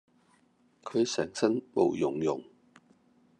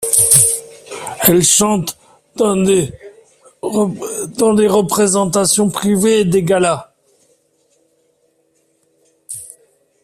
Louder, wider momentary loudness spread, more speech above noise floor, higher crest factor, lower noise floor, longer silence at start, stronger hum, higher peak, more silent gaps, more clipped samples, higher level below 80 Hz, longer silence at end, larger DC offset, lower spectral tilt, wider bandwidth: second, -30 LUFS vs -13 LUFS; second, 8 LU vs 19 LU; second, 38 dB vs 47 dB; about the same, 20 dB vs 16 dB; first, -67 dBFS vs -60 dBFS; first, 0.85 s vs 0 s; neither; second, -12 dBFS vs 0 dBFS; neither; neither; second, -74 dBFS vs -50 dBFS; first, 0.95 s vs 0.55 s; neither; first, -5 dB/octave vs -3.5 dB/octave; second, 9.6 kHz vs 16 kHz